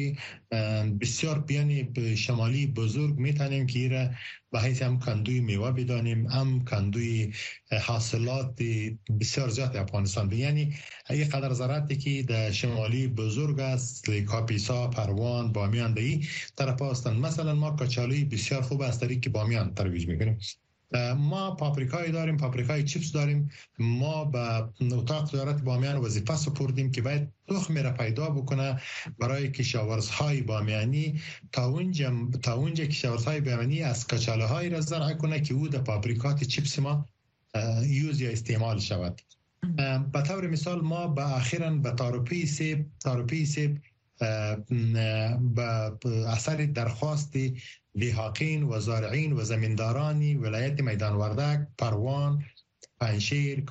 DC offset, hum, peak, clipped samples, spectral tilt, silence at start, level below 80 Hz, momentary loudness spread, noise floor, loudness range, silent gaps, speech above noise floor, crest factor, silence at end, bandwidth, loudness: under 0.1%; none; -14 dBFS; under 0.1%; -6 dB/octave; 0 s; -58 dBFS; 4 LU; -48 dBFS; 1 LU; none; 20 dB; 14 dB; 0 s; 8.4 kHz; -29 LUFS